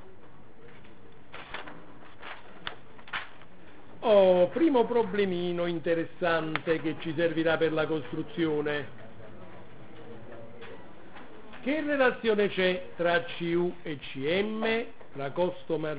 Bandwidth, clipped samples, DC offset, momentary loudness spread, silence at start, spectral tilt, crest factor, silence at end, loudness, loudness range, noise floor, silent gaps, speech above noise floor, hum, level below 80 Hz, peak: 4 kHz; under 0.1%; 1%; 24 LU; 0.05 s; -9.5 dB/octave; 20 dB; 0 s; -28 LUFS; 14 LU; -54 dBFS; none; 26 dB; none; -62 dBFS; -10 dBFS